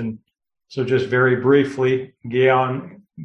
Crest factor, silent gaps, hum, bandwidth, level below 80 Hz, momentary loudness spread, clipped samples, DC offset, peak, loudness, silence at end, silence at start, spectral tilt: 16 dB; none; none; 8.2 kHz; -60 dBFS; 14 LU; under 0.1%; under 0.1%; -4 dBFS; -19 LUFS; 0 s; 0 s; -7.5 dB/octave